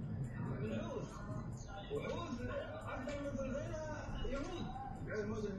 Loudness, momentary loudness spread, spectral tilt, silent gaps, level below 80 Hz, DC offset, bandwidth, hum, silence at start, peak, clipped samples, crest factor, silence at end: -44 LUFS; 4 LU; -6.5 dB/octave; none; -52 dBFS; under 0.1%; 12 kHz; none; 0 s; -30 dBFS; under 0.1%; 14 dB; 0 s